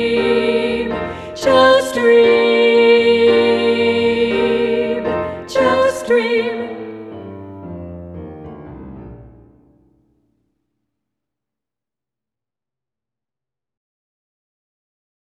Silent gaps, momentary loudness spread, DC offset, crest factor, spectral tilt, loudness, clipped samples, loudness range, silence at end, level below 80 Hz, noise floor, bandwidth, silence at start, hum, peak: none; 22 LU; under 0.1%; 16 dB; -4.5 dB/octave; -14 LUFS; under 0.1%; 22 LU; 6 s; -48 dBFS; -90 dBFS; 12.5 kHz; 0 s; none; 0 dBFS